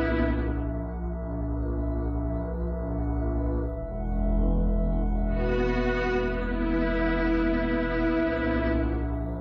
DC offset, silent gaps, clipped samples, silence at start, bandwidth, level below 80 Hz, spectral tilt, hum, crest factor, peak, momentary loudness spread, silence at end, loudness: under 0.1%; none; under 0.1%; 0 s; 5.8 kHz; -30 dBFS; -9 dB/octave; none; 12 dB; -14 dBFS; 6 LU; 0 s; -28 LUFS